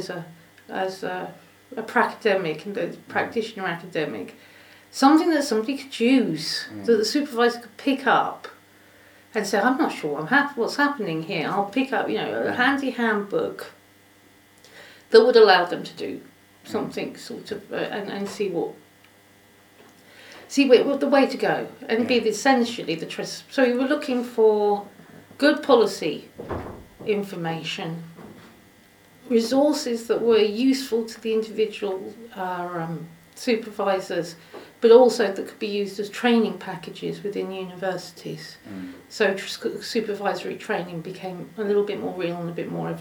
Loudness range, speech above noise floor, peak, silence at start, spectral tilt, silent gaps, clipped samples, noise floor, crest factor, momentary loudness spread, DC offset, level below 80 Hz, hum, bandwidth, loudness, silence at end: 7 LU; 31 dB; 0 dBFS; 0 s; -4.5 dB/octave; none; under 0.1%; -54 dBFS; 22 dB; 16 LU; under 0.1%; -64 dBFS; none; 19.5 kHz; -23 LUFS; 0 s